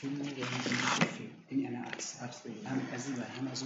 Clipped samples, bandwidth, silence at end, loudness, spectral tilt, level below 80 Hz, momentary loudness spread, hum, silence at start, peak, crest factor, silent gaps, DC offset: under 0.1%; 8 kHz; 0 s; -36 LUFS; -3.5 dB/octave; -80 dBFS; 12 LU; none; 0 s; -14 dBFS; 22 dB; none; under 0.1%